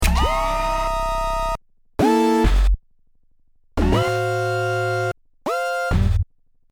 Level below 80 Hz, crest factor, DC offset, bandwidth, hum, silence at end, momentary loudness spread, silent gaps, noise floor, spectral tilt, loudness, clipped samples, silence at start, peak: -24 dBFS; 16 dB; under 0.1%; 20 kHz; none; 0.5 s; 10 LU; none; -55 dBFS; -6 dB/octave; -21 LUFS; under 0.1%; 0 s; -6 dBFS